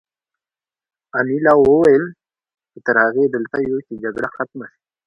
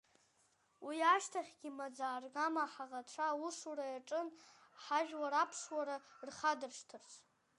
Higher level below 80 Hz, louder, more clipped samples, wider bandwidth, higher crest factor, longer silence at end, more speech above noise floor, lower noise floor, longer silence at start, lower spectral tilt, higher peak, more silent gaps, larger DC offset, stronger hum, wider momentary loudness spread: first, -54 dBFS vs under -90 dBFS; first, -17 LUFS vs -40 LUFS; neither; second, 7.4 kHz vs 11.5 kHz; about the same, 18 dB vs 22 dB; about the same, 0.4 s vs 0.4 s; first, over 74 dB vs 36 dB; first, under -90 dBFS vs -76 dBFS; first, 1.15 s vs 0.8 s; first, -8 dB/octave vs -1 dB/octave; first, 0 dBFS vs -20 dBFS; neither; neither; neither; about the same, 15 LU vs 17 LU